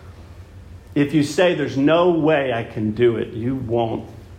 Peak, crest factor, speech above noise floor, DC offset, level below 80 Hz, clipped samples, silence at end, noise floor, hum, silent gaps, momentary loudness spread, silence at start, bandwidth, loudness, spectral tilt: -4 dBFS; 16 dB; 21 dB; under 0.1%; -48 dBFS; under 0.1%; 0 s; -40 dBFS; none; none; 9 LU; 0 s; 14.5 kHz; -19 LUFS; -6.5 dB/octave